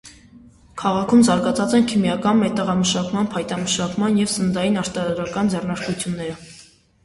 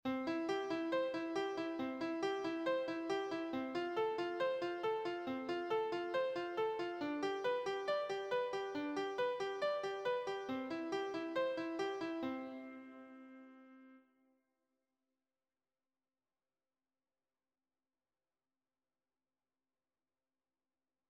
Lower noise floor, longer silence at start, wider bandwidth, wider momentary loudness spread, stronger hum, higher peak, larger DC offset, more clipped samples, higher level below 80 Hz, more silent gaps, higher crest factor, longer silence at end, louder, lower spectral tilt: second, -49 dBFS vs under -90 dBFS; about the same, 0.05 s vs 0.05 s; first, 11.5 kHz vs 9.8 kHz; first, 9 LU vs 4 LU; neither; first, -4 dBFS vs -26 dBFS; neither; neither; first, -50 dBFS vs -82 dBFS; neither; about the same, 16 dB vs 16 dB; second, 0.45 s vs 7.1 s; first, -20 LUFS vs -40 LUFS; about the same, -5 dB/octave vs -4.5 dB/octave